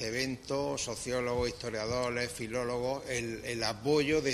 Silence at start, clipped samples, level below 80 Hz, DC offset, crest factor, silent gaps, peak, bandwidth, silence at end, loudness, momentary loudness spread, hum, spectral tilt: 0 s; under 0.1%; -54 dBFS; under 0.1%; 18 dB; none; -14 dBFS; 13.5 kHz; 0 s; -33 LUFS; 6 LU; none; -4 dB/octave